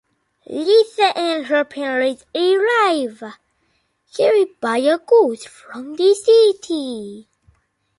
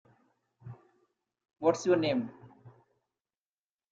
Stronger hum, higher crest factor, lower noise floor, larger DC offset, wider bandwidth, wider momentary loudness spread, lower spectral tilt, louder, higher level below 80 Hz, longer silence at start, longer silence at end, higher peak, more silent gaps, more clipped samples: neither; second, 16 dB vs 22 dB; second, -66 dBFS vs under -90 dBFS; neither; first, 11.5 kHz vs 8 kHz; second, 19 LU vs 24 LU; second, -3 dB/octave vs -5.5 dB/octave; first, -17 LUFS vs -29 LUFS; first, -68 dBFS vs -74 dBFS; second, 0.5 s vs 0.65 s; second, 0.75 s vs 1.25 s; first, -2 dBFS vs -12 dBFS; neither; neither